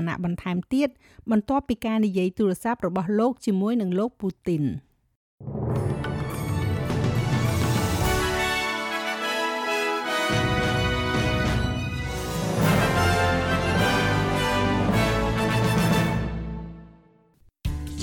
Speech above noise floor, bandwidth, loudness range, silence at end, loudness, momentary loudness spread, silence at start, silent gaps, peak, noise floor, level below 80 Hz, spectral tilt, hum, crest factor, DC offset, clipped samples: 34 dB; 18 kHz; 5 LU; 0 s; -24 LUFS; 8 LU; 0 s; 5.16-5.38 s; -10 dBFS; -59 dBFS; -38 dBFS; -5.5 dB/octave; none; 14 dB; under 0.1%; under 0.1%